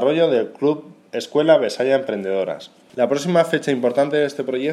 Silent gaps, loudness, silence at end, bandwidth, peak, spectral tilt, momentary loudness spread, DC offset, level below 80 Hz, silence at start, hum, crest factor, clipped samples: none; -19 LUFS; 0 s; 13.5 kHz; -2 dBFS; -5.5 dB/octave; 12 LU; under 0.1%; -76 dBFS; 0 s; none; 18 dB; under 0.1%